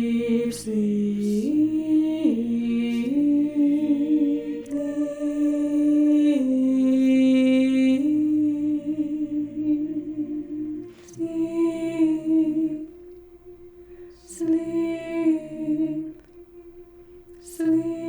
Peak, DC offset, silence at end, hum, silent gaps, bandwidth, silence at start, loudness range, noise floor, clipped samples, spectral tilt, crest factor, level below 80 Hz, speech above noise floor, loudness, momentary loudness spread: -10 dBFS; under 0.1%; 0 s; none; none; over 20 kHz; 0 s; 7 LU; -47 dBFS; under 0.1%; -6.5 dB/octave; 14 dB; -58 dBFS; 24 dB; -23 LUFS; 11 LU